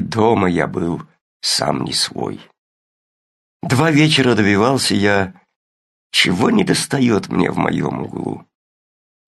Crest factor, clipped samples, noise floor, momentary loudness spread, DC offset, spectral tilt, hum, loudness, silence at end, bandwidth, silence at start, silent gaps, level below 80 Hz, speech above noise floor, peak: 18 dB; under 0.1%; under -90 dBFS; 13 LU; under 0.1%; -4.5 dB/octave; none; -16 LUFS; 0.9 s; 12.5 kHz; 0 s; 1.21-1.40 s, 2.58-3.60 s, 5.56-6.10 s; -46 dBFS; over 74 dB; 0 dBFS